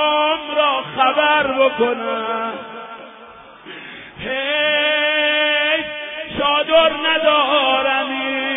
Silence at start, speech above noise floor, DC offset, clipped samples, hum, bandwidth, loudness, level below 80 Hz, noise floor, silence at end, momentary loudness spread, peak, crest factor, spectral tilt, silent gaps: 0 s; 23 dB; under 0.1%; under 0.1%; none; 3.9 kHz; -16 LUFS; -54 dBFS; -40 dBFS; 0 s; 18 LU; -2 dBFS; 16 dB; -6 dB/octave; none